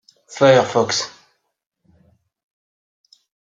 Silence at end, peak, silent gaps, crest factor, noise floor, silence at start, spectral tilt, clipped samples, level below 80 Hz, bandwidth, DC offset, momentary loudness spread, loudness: 2.5 s; -2 dBFS; none; 20 dB; -60 dBFS; 0.3 s; -4 dB/octave; under 0.1%; -66 dBFS; 9.2 kHz; under 0.1%; 18 LU; -16 LUFS